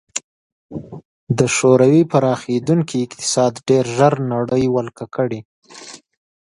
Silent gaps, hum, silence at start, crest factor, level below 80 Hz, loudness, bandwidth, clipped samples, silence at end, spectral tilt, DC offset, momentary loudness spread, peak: 0.24-0.69 s, 1.05-1.27 s, 5.45-5.62 s; none; 0.15 s; 18 dB; -54 dBFS; -17 LUFS; 11.5 kHz; under 0.1%; 0.6 s; -5.5 dB/octave; under 0.1%; 21 LU; 0 dBFS